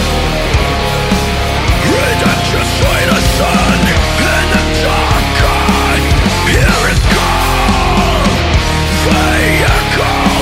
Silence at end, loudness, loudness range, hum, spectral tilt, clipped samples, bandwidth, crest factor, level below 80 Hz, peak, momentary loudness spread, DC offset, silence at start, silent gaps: 0 s; -11 LUFS; 1 LU; none; -4.5 dB/octave; under 0.1%; 16.5 kHz; 10 dB; -16 dBFS; 0 dBFS; 3 LU; under 0.1%; 0 s; none